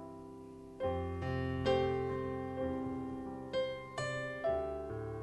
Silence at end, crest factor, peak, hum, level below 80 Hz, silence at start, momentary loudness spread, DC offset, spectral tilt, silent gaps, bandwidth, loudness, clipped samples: 0 s; 18 dB; -20 dBFS; none; -52 dBFS; 0 s; 12 LU; under 0.1%; -6.5 dB/octave; none; 12 kHz; -38 LUFS; under 0.1%